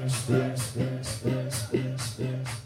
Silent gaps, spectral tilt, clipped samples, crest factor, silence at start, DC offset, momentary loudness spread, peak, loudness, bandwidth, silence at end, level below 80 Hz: none; -5.5 dB/octave; under 0.1%; 20 dB; 0 s; under 0.1%; 6 LU; -10 dBFS; -30 LUFS; 15.5 kHz; 0 s; -56 dBFS